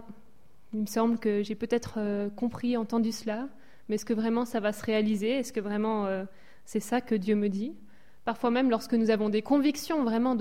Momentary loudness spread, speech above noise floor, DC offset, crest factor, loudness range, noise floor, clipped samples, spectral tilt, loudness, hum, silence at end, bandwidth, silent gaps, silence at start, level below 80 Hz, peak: 10 LU; 35 dB; 0.5%; 14 dB; 3 LU; -63 dBFS; under 0.1%; -5.5 dB/octave; -29 LUFS; none; 0 s; 16 kHz; none; 0.05 s; -64 dBFS; -14 dBFS